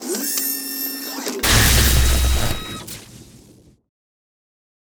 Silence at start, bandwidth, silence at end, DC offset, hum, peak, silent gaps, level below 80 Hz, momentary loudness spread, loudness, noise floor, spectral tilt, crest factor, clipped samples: 0 s; over 20 kHz; 1.65 s; under 0.1%; none; -6 dBFS; none; -24 dBFS; 17 LU; -18 LUFS; -49 dBFS; -3 dB/octave; 14 dB; under 0.1%